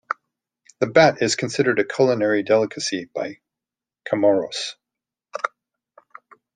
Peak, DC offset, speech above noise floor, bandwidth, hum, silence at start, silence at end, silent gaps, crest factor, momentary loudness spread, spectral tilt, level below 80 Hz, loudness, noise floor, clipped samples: -2 dBFS; under 0.1%; 69 dB; 9.6 kHz; none; 0.1 s; 1.1 s; none; 20 dB; 15 LU; -4 dB/octave; -66 dBFS; -21 LUFS; -89 dBFS; under 0.1%